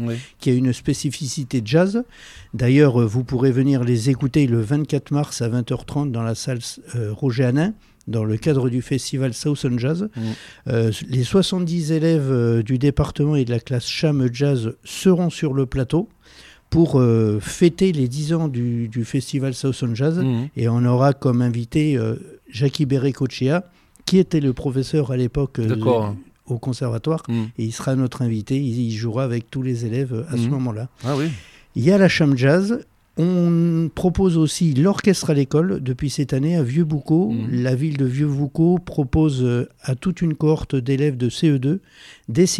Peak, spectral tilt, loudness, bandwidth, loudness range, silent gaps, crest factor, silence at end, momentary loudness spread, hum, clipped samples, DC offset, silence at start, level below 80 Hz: -2 dBFS; -7 dB/octave; -20 LUFS; 13.5 kHz; 4 LU; none; 18 dB; 0 s; 8 LU; none; under 0.1%; under 0.1%; 0 s; -44 dBFS